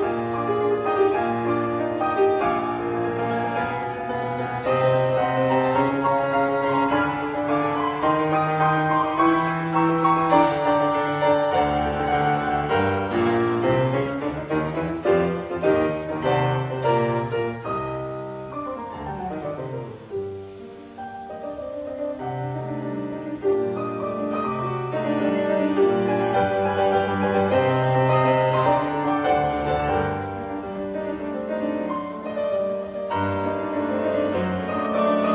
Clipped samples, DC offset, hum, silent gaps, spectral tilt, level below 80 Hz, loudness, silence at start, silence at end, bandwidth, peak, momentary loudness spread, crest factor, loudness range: under 0.1%; under 0.1%; none; none; -11 dB/octave; -48 dBFS; -23 LUFS; 0 s; 0 s; 4 kHz; -6 dBFS; 11 LU; 18 dB; 9 LU